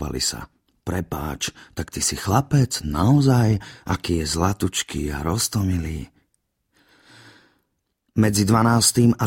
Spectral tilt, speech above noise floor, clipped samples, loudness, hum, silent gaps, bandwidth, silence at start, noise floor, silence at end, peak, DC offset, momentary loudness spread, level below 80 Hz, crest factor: -5 dB/octave; 53 dB; under 0.1%; -21 LUFS; none; none; 16.5 kHz; 0 s; -73 dBFS; 0 s; -2 dBFS; under 0.1%; 13 LU; -40 dBFS; 20 dB